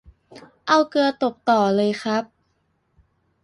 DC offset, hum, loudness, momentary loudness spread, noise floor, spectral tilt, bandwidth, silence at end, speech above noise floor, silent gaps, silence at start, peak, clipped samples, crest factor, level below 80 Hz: under 0.1%; none; -20 LUFS; 9 LU; -68 dBFS; -5 dB/octave; 11.5 kHz; 1.2 s; 49 dB; none; 0.35 s; -2 dBFS; under 0.1%; 20 dB; -62 dBFS